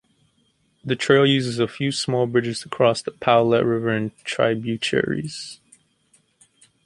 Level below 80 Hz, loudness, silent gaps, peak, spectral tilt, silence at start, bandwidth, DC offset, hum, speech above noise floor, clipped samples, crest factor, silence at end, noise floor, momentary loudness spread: -60 dBFS; -21 LUFS; none; -2 dBFS; -5 dB/octave; 0.85 s; 11.5 kHz; under 0.1%; none; 44 dB; under 0.1%; 20 dB; 1.3 s; -65 dBFS; 11 LU